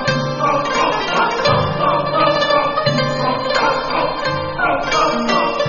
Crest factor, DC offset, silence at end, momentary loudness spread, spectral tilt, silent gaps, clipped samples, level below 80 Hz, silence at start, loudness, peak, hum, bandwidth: 16 dB; under 0.1%; 0 s; 4 LU; -3 dB/octave; none; under 0.1%; -40 dBFS; 0 s; -16 LUFS; -2 dBFS; none; 7.4 kHz